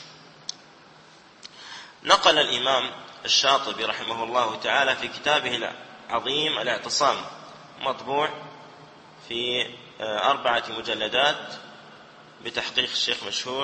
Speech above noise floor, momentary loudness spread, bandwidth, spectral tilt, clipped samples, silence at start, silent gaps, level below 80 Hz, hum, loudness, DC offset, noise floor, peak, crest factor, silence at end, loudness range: 26 dB; 20 LU; 8.8 kHz; -1.5 dB/octave; under 0.1%; 0 s; none; -66 dBFS; none; -24 LUFS; under 0.1%; -51 dBFS; -2 dBFS; 24 dB; 0 s; 5 LU